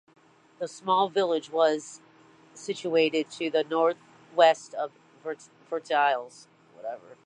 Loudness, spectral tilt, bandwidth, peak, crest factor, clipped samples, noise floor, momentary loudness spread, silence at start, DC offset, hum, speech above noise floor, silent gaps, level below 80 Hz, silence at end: -26 LUFS; -3.5 dB/octave; 10 kHz; -6 dBFS; 22 dB; under 0.1%; -56 dBFS; 19 LU; 0.6 s; under 0.1%; none; 30 dB; none; -84 dBFS; 0.3 s